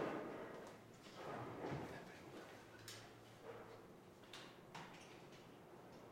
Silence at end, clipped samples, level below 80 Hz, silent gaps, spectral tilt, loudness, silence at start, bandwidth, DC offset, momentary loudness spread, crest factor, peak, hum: 0 s; under 0.1%; -80 dBFS; none; -5 dB/octave; -55 LUFS; 0 s; 16 kHz; under 0.1%; 12 LU; 20 dB; -32 dBFS; none